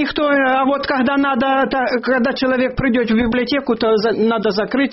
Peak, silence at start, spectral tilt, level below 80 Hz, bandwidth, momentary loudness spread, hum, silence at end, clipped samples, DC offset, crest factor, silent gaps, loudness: -6 dBFS; 0 s; -3 dB/octave; -42 dBFS; 6 kHz; 3 LU; none; 0 s; under 0.1%; under 0.1%; 10 dB; none; -16 LUFS